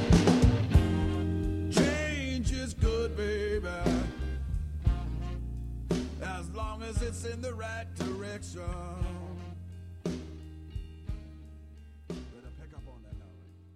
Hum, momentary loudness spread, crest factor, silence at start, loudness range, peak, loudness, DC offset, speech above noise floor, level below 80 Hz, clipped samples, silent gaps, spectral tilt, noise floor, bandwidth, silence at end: none; 22 LU; 22 dB; 0 s; 14 LU; -10 dBFS; -32 LUFS; under 0.1%; 16 dB; -36 dBFS; under 0.1%; none; -6 dB/octave; -52 dBFS; 13.5 kHz; 0 s